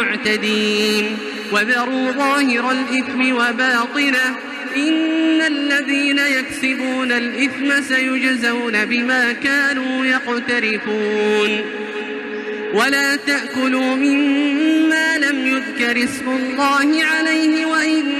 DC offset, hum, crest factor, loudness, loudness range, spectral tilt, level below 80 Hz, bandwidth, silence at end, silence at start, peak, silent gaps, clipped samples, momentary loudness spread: under 0.1%; none; 14 dB; -17 LUFS; 2 LU; -3 dB/octave; -62 dBFS; 14.5 kHz; 0 s; 0 s; -4 dBFS; none; under 0.1%; 5 LU